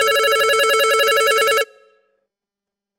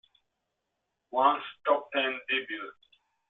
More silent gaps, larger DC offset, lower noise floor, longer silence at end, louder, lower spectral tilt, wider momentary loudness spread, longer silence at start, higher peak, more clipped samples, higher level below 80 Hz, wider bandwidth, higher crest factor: neither; neither; about the same, -86 dBFS vs -83 dBFS; first, 1.35 s vs 0.6 s; first, -15 LUFS vs -29 LUFS; about the same, 1.5 dB/octave vs 1.5 dB/octave; second, 4 LU vs 13 LU; second, 0 s vs 1.15 s; first, -4 dBFS vs -10 dBFS; neither; first, -62 dBFS vs -78 dBFS; first, 16.5 kHz vs 4.2 kHz; second, 14 dB vs 22 dB